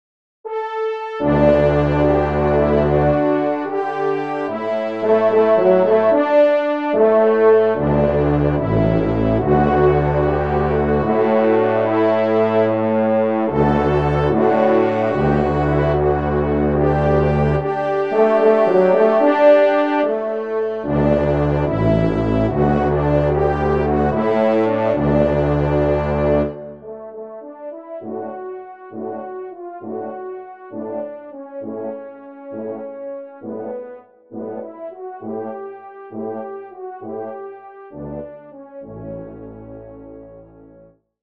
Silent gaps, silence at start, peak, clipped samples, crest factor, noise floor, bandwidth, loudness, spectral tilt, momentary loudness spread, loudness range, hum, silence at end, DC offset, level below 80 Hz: none; 0.45 s; -2 dBFS; under 0.1%; 16 dB; -49 dBFS; 6.6 kHz; -17 LUFS; -9.5 dB/octave; 19 LU; 16 LU; none; 0.8 s; 0.3%; -34 dBFS